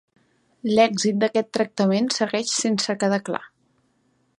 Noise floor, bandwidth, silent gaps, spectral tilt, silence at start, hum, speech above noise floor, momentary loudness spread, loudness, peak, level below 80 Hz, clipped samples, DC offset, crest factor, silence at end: -66 dBFS; 11.5 kHz; none; -4 dB/octave; 0.65 s; none; 45 dB; 7 LU; -22 LUFS; -4 dBFS; -68 dBFS; under 0.1%; under 0.1%; 20 dB; 0.9 s